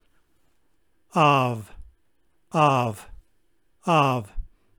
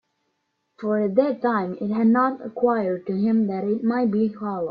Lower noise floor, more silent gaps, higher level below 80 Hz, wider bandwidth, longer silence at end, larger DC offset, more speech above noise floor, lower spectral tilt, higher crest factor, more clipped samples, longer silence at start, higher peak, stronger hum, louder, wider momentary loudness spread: about the same, -71 dBFS vs -74 dBFS; neither; first, -46 dBFS vs -68 dBFS; first, over 20 kHz vs 5 kHz; first, 0.3 s vs 0 s; neither; about the same, 50 dB vs 52 dB; second, -6 dB/octave vs -10.5 dB/octave; about the same, 20 dB vs 16 dB; neither; first, 1.15 s vs 0.8 s; about the same, -6 dBFS vs -6 dBFS; neither; about the same, -22 LUFS vs -23 LUFS; first, 20 LU vs 6 LU